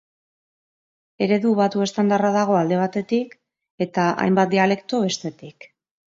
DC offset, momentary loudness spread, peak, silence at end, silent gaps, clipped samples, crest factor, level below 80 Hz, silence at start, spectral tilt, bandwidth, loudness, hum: under 0.1%; 8 LU; -4 dBFS; 0.65 s; 3.70-3.78 s; under 0.1%; 18 dB; -68 dBFS; 1.2 s; -6 dB/octave; 7.8 kHz; -20 LUFS; none